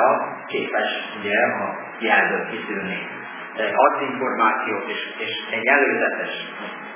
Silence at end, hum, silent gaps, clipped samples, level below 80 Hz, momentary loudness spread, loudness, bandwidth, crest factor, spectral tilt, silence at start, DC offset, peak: 0 s; none; none; under 0.1%; -74 dBFS; 11 LU; -22 LUFS; 3.6 kHz; 20 dB; -7.5 dB/octave; 0 s; under 0.1%; -2 dBFS